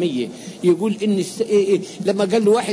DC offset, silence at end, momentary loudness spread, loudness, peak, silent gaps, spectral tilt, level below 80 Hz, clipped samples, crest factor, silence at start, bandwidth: under 0.1%; 0 s; 6 LU; -19 LUFS; -6 dBFS; none; -5.5 dB/octave; -66 dBFS; under 0.1%; 12 dB; 0 s; 11 kHz